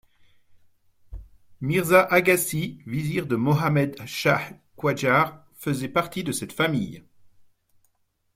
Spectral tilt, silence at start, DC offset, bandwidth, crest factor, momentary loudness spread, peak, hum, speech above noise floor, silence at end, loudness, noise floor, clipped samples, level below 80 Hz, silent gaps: -5 dB/octave; 1.1 s; under 0.1%; 16.5 kHz; 22 dB; 11 LU; -4 dBFS; none; 48 dB; 1.35 s; -23 LUFS; -71 dBFS; under 0.1%; -54 dBFS; none